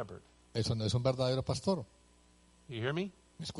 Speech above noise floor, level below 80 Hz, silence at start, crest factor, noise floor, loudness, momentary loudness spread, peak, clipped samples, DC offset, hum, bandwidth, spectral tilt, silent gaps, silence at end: 30 dB; -60 dBFS; 0 s; 20 dB; -64 dBFS; -35 LUFS; 15 LU; -16 dBFS; under 0.1%; under 0.1%; 60 Hz at -65 dBFS; 11.5 kHz; -6 dB/octave; none; 0 s